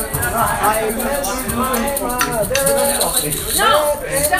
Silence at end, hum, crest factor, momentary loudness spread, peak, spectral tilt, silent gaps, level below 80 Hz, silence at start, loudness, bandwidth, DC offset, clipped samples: 0 s; none; 18 dB; 5 LU; 0 dBFS; -2.5 dB/octave; none; -34 dBFS; 0 s; -16 LUFS; 16 kHz; under 0.1%; under 0.1%